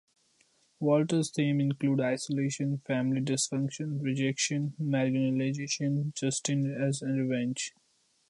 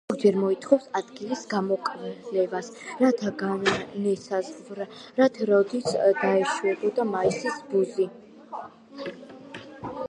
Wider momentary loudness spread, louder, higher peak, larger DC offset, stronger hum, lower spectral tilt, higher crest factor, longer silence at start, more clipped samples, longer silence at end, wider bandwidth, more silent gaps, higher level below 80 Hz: second, 5 LU vs 16 LU; second, -30 LUFS vs -25 LUFS; second, -14 dBFS vs -6 dBFS; neither; neither; about the same, -5 dB/octave vs -5.5 dB/octave; about the same, 16 dB vs 20 dB; first, 0.8 s vs 0.1 s; neither; first, 0.6 s vs 0 s; about the same, 11.5 kHz vs 10.5 kHz; neither; second, -74 dBFS vs -66 dBFS